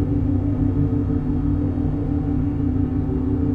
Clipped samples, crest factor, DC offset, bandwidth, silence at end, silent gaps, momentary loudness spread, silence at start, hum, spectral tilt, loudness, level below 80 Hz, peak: under 0.1%; 12 dB; under 0.1%; 3.5 kHz; 0 s; none; 2 LU; 0 s; none; -12 dB/octave; -22 LUFS; -28 dBFS; -8 dBFS